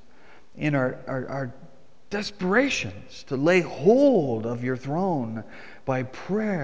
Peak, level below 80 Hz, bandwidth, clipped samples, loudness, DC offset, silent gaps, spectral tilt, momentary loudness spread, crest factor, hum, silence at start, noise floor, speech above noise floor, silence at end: -6 dBFS; -58 dBFS; 8 kHz; under 0.1%; -25 LUFS; 0.7%; none; -6 dB/octave; 14 LU; 18 dB; none; 0.55 s; -55 dBFS; 30 dB; 0 s